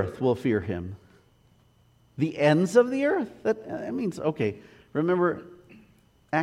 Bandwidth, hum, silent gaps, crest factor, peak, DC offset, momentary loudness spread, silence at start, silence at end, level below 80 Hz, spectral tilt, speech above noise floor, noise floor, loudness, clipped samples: 13 kHz; none; none; 20 dB; -8 dBFS; under 0.1%; 15 LU; 0 s; 0 s; -60 dBFS; -7 dB/octave; 36 dB; -61 dBFS; -26 LUFS; under 0.1%